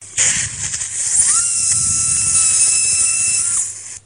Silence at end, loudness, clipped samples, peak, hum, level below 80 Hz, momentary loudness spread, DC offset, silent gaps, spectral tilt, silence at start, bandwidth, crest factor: 0.05 s; -13 LUFS; under 0.1%; 0 dBFS; none; -46 dBFS; 8 LU; 0.1%; none; 1 dB/octave; 0 s; 10.5 kHz; 16 dB